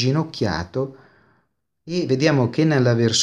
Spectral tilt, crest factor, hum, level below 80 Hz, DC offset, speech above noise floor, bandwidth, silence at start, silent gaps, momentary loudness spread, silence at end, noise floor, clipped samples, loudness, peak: -5 dB/octave; 18 dB; none; -52 dBFS; under 0.1%; 50 dB; 10.5 kHz; 0 s; none; 10 LU; 0 s; -69 dBFS; under 0.1%; -21 LUFS; -2 dBFS